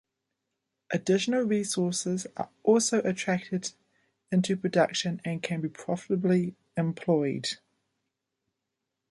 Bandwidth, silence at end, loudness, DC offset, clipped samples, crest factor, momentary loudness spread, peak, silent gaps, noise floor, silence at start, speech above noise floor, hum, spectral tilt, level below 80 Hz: 11.5 kHz; 1.55 s; -28 LUFS; under 0.1%; under 0.1%; 20 dB; 9 LU; -10 dBFS; none; -85 dBFS; 0.9 s; 57 dB; none; -5 dB/octave; -72 dBFS